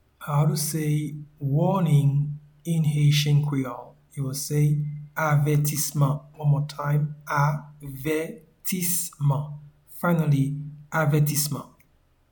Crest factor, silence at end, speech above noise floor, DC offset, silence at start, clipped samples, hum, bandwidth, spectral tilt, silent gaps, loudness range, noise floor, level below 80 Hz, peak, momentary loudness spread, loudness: 16 dB; 0.65 s; 39 dB; under 0.1%; 0.2 s; under 0.1%; none; 19 kHz; -5.5 dB/octave; none; 3 LU; -62 dBFS; -56 dBFS; -10 dBFS; 13 LU; -24 LUFS